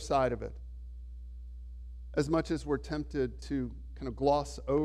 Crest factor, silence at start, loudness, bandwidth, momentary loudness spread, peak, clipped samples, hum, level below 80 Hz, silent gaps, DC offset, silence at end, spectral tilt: 18 dB; 0 s; -33 LUFS; 12 kHz; 18 LU; -14 dBFS; under 0.1%; none; -44 dBFS; none; under 0.1%; 0 s; -6.5 dB/octave